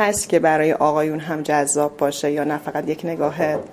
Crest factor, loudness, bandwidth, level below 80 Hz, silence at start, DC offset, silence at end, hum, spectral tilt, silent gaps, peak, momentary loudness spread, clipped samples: 18 dB; -20 LUFS; 16 kHz; -56 dBFS; 0 s; under 0.1%; 0 s; none; -4.5 dB/octave; none; -2 dBFS; 7 LU; under 0.1%